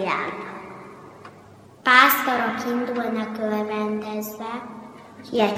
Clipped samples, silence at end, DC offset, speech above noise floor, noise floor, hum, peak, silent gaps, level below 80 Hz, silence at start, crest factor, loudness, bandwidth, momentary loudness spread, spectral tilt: under 0.1%; 0 s; under 0.1%; 25 dB; -47 dBFS; none; -2 dBFS; none; -68 dBFS; 0 s; 22 dB; -22 LUFS; 16.5 kHz; 26 LU; -3.5 dB/octave